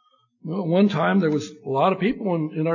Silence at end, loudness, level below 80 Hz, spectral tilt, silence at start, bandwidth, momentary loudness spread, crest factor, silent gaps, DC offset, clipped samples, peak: 0 s; -22 LUFS; -62 dBFS; -7.5 dB/octave; 0.45 s; 7.4 kHz; 9 LU; 16 dB; none; under 0.1%; under 0.1%; -6 dBFS